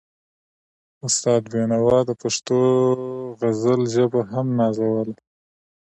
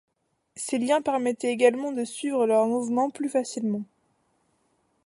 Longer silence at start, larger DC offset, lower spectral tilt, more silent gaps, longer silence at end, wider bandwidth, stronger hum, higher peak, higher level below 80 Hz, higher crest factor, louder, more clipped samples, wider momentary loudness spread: first, 1.05 s vs 0.55 s; neither; about the same, -5.5 dB/octave vs -4.5 dB/octave; neither; second, 0.85 s vs 1.2 s; about the same, 11 kHz vs 11.5 kHz; neither; about the same, -6 dBFS vs -6 dBFS; first, -60 dBFS vs -78 dBFS; about the same, 16 dB vs 20 dB; first, -20 LUFS vs -26 LUFS; neither; about the same, 8 LU vs 8 LU